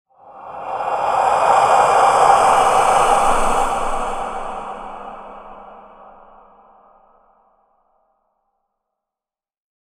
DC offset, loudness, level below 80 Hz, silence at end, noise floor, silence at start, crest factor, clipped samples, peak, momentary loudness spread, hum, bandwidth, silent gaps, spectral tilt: under 0.1%; -15 LUFS; -36 dBFS; 4.1 s; under -90 dBFS; 0.3 s; 18 dB; under 0.1%; 0 dBFS; 22 LU; none; 14 kHz; none; -2.5 dB/octave